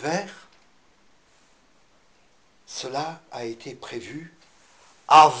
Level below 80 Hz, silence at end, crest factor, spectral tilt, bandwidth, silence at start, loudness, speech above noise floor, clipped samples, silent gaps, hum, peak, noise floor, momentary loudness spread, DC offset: -66 dBFS; 0 s; 22 dB; -3.5 dB/octave; 9.6 kHz; 0 s; -23 LUFS; 40 dB; under 0.1%; none; none; -4 dBFS; -62 dBFS; 25 LU; under 0.1%